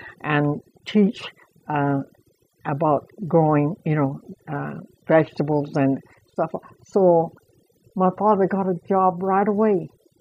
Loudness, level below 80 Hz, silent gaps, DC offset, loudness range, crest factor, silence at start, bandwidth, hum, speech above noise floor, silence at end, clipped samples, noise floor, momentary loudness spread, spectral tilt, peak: -22 LUFS; -64 dBFS; none; under 0.1%; 3 LU; 16 dB; 0 s; 8 kHz; none; 38 dB; 0.35 s; under 0.1%; -59 dBFS; 16 LU; -9 dB/octave; -6 dBFS